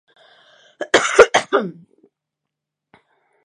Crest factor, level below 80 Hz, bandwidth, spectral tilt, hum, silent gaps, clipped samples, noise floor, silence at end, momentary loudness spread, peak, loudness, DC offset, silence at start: 20 dB; -54 dBFS; 11 kHz; -2 dB/octave; none; none; under 0.1%; -82 dBFS; 1.75 s; 18 LU; 0 dBFS; -15 LUFS; under 0.1%; 0.8 s